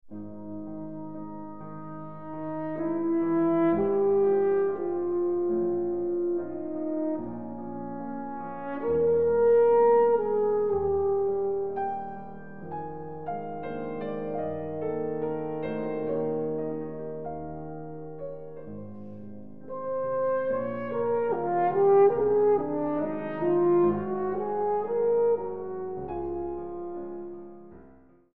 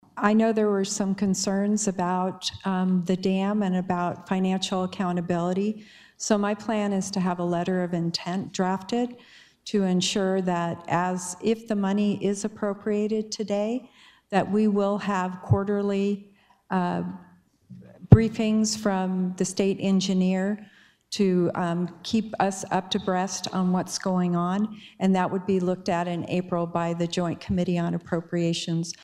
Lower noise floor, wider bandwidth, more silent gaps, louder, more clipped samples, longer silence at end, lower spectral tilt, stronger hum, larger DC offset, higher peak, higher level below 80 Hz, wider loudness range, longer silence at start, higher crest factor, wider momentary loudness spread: first, -55 dBFS vs -50 dBFS; second, 4 kHz vs 12.5 kHz; neither; about the same, -27 LUFS vs -26 LUFS; neither; about the same, 0 s vs 0.1 s; first, -11.5 dB/octave vs -5.5 dB/octave; neither; first, 0.6% vs under 0.1%; second, -10 dBFS vs 0 dBFS; second, -60 dBFS vs -50 dBFS; first, 10 LU vs 3 LU; second, 0 s vs 0.15 s; second, 16 dB vs 26 dB; first, 18 LU vs 6 LU